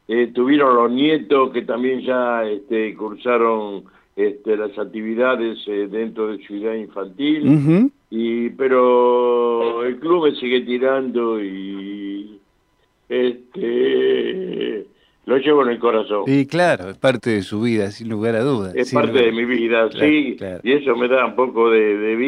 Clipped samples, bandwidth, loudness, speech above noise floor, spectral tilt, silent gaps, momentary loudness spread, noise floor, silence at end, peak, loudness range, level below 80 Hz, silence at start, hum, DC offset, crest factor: under 0.1%; 11 kHz; -18 LUFS; 44 dB; -7 dB/octave; none; 11 LU; -62 dBFS; 0 s; -2 dBFS; 5 LU; -66 dBFS; 0.1 s; none; under 0.1%; 16 dB